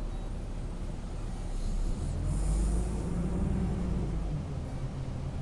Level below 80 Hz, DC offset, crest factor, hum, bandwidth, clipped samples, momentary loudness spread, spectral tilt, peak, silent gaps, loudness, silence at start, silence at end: -34 dBFS; under 0.1%; 14 dB; none; 11.5 kHz; under 0.1%; 8 LU; -7 dB/octave; -18 dBFS; none; -35 LUFS; 0 s; 0 s